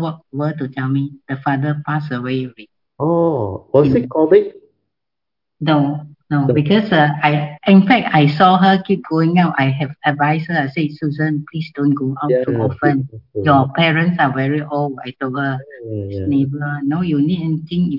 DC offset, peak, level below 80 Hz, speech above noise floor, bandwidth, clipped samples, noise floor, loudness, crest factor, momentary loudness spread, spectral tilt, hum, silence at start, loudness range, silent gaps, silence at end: under 0.1%; 0 dBFS; -56 dBFS; 68 dB; 5.8 kHz; under 0.1%; -84 dBFS; -16 LUFS; 16 dB; 11 LU; -9.5 dB/octave; none; 0 s; 6 LU; none; 0 s